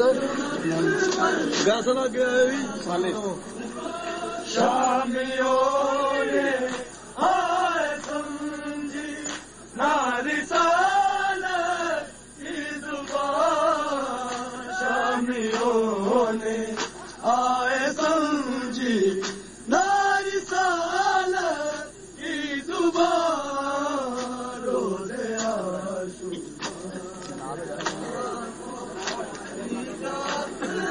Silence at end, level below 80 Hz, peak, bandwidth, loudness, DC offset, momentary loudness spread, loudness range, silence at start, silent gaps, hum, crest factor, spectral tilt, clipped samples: 0 s; -58 dBFS; -8 dBFS; 10.5 kHz; -25 LUFS; under 0.1%; 12 LU; 7 LU; 0 s; none; none; 18 dB; -3.5 dB/octave; under 0.1%